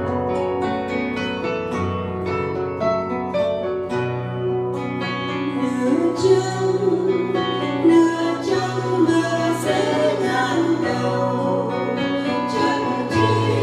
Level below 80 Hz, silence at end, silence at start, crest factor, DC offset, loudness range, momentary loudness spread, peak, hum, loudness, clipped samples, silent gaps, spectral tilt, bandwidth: -54 dBFS; 0 s; 0 s; 16 dB; under 0.1%; 4 LU; 6 LU; -4 dBFS; none; -21 LUFS; under 0.1%; none; -6 dB/octave; 13 kHz